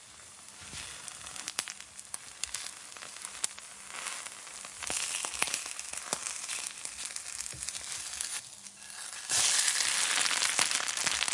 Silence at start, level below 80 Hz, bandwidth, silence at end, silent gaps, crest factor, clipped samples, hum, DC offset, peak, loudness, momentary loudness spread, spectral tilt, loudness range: 0 s; -68 dBFS; 11.5 kHz; 0 s; none; 30 dB; under 0.1%; none; under 0.1%; -6 dBFS; -32 LUFS; 17 LU; 1.5 dB/octave; 10 LU